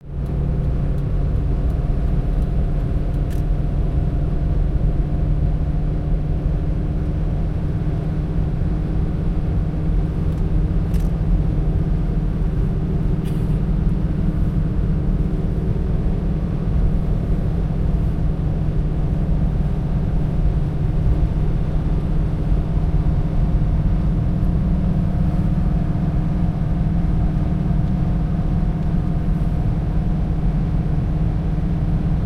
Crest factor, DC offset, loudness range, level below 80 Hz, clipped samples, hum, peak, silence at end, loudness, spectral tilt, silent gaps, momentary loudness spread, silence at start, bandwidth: 12 dB; under 0.1%; 2 LU; -20 dBFS; under 0.1%; none; -6 dBFS; 0 s; -21 LUFS; -10 dB/octave; none; 2 LU; 0 s; 5 kHz